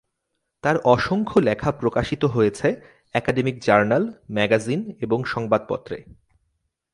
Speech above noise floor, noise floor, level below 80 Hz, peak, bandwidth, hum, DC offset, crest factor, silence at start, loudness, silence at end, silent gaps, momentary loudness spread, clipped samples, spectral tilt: 56 dB; -77 dBFS; -50 dBFS; -2 dBFS; 11.5 kHz; none; under 0.1%; 22 dB; 0.65 s; -22 LUFS; 0.9 s; none; 9 LU; under 0.1%; -6.5 dB/octave